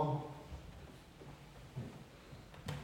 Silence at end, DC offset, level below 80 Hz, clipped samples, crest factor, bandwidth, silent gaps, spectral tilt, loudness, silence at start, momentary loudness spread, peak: 0 s; under 0.1%; -60 dBFS; under 0.1%; 22 dB; 16.5 kHz; none; -7 dB/octave; -49 LUFS; 0 s; 12 LU; -24 dBFS